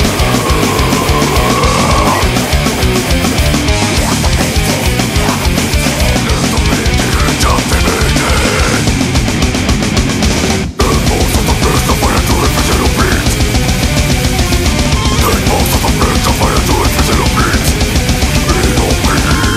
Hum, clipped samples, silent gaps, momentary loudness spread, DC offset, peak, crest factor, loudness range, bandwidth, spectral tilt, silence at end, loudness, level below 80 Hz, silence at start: none; under 0.1%; none; 2 LU; under 0.1%; 0 dBFS; 10 dB; 1 LU; 16.5 kHz; -4 dB/octave; 0 s; -11 LUFS; -16 dBFS; 0 s